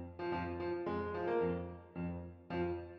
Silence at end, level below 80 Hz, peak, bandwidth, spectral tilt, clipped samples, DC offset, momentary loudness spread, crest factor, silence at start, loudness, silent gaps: 0 s; -66 dBFS; -24 dBFS; 5.8 kHz; -6.5 dB/octave; under 0.1%; under 0.1%; 8 LU; 16 dB; 0 s; -40 LUFS; none